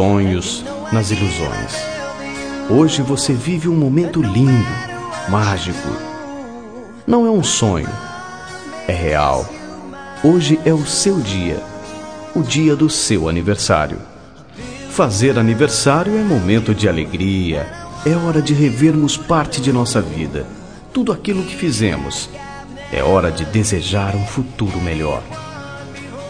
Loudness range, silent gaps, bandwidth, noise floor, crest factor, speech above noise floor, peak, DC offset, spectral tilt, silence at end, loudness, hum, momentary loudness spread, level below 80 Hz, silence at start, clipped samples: 3 LU; none; 10.5 kHz; -37 dBFS; 16 dB; 21 dB; 0 dBFS; 0.4%; -5 dB/octave; 0 s; -17 LUFS; none; 17 LU; -36 dBFS; 0 s; under 0.1%